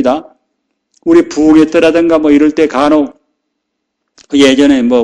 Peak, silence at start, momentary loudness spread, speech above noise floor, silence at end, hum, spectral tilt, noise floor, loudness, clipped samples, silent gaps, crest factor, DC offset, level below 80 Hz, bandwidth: 0 dBFS; 0 s; 9 LU; 63 dB; 0 s; none; -5 dB/octave; -70 dBFS; -9 LUFS; 1%; none; 10 dB; under 0.1%; -42 dBFS; 10 kHz